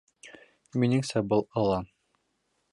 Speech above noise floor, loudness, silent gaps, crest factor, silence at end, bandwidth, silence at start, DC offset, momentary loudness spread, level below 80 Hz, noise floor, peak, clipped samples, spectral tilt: 49 dB; -28 LUFS; none; 18 dB; 0.9 s; 11.5 kHz; 0.25 s; under 0.1%; 8 LU; -58 dBFS; -76 dBFS; -12 dBFS; under 0.1%; -7 dB/octave